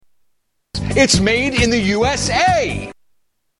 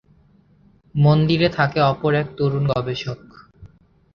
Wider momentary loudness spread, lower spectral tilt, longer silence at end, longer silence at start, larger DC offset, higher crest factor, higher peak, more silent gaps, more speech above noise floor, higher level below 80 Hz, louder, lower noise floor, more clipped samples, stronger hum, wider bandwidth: about the same, 14 LU vs 13 LU; second, -4 dB/octave vs -8 dB/octave; first, 0.7 s vs 0.5 s; second, 0.75 s vs 0.95 s; neither; about the same, 18 dB vs 18 dB; first, 0 dBFS vs -4 dBFS; neither; first, 50 dB vs 36 dB; first, -34 dBFS vs -48 dBFS; first, -15 LUFS vs -19 LUFS; first, -66 dBFS vs -55 dBFS; neither; neither; first, 12 kHz vs 6.6 kHz